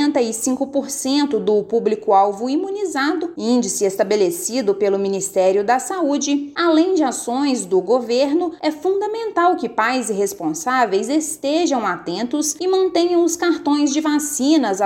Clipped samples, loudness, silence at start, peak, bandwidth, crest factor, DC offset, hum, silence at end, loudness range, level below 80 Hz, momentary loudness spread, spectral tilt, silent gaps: under 0.1%; -18 LUFS; 0 s; -4 dBFS; 16.5 kHz; 14 dB; under 0.1%; none; 0 s; 1 LU; -64 dBFS; 5 LU; -3.5 dB/octave; none